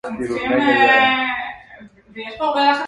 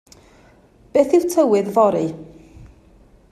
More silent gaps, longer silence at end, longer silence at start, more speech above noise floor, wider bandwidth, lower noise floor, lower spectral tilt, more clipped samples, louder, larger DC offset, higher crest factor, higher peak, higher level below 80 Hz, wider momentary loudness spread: neither; second, 0 s vs 0.65 s; second, 0.05 s vs 0.95 s; second, 26 dB vs 34 dB; second, 11 kHz vs 14.5 kHz; second, -43 dBFS vs -51 dBFS; second, -4.5 dB/octave vs -6 dB/octave; neither; about the same, -16 LUFS vs -17 LUFS; neither; about the same, 18 dB vs 18 dB; about the same, 0 dBFS vs -2 dBFS; about the same, -54 dBFS vs -52 dBFS; first, 20 LU vs 10 LU